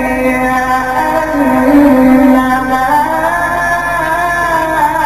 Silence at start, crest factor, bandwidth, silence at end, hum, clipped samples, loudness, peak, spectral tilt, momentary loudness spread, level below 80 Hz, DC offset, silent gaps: 0 s; 10 dB; 14.5 kHz; 0 s; none; under 0.1%; -10 LUFS; 0 dBFS; -5.5 dB/octave; 6 LU; -32 dBFS; 0.4%; none